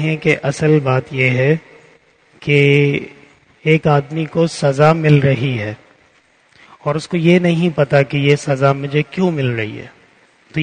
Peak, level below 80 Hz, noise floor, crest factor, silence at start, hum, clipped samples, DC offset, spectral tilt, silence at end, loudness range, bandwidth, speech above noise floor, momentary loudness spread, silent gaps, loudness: 0 dBFS; -50 dBFS; -54 dBFS; 16 dB; 0 s; none; under 0.1%; under 0.1%; -7 dB/octave; 0 s; 2 LU; 9.6 kHz; 39 dB; 11 LU; none; -15 LUFS